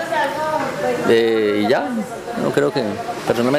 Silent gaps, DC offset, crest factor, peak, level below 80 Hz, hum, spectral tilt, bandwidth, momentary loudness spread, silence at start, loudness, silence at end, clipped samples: none; under 0.1%; 16 dB; -4 dBFS; -56 dBFS; none; -5.5 dB/octave; 15.5 kHz; 9 LU; 0 s; -19 LUFS; 0 s; under 0.1%